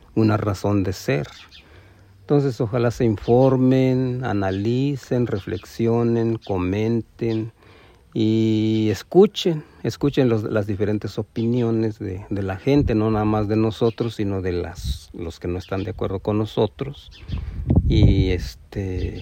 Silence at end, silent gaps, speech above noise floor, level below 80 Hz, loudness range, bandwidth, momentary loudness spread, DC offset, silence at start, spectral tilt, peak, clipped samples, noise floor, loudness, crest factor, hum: 0 s; none; 29 dB; -36 dBFS; 4 LU; 16 kHz; 13 LU; under 0.1%; 0.15 s; -8 dB/octave; -2 dBFS; under 0.1%; -49 dBFS; -22 LUFS; 20 dB; none